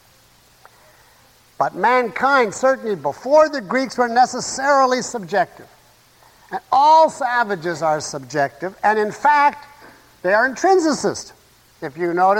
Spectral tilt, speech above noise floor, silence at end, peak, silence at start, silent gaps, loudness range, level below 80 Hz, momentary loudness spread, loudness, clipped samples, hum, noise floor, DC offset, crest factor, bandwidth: -3.5 dB/octave; 35 dB; 0 s; -4 dBFS; 1.6 s; none; 2 LU; -60 dBFS; 10 LU; -18 LUFS; under 0.1%; none; -53 dBFS; under 0.1%; 16 dB; 16.5 kHz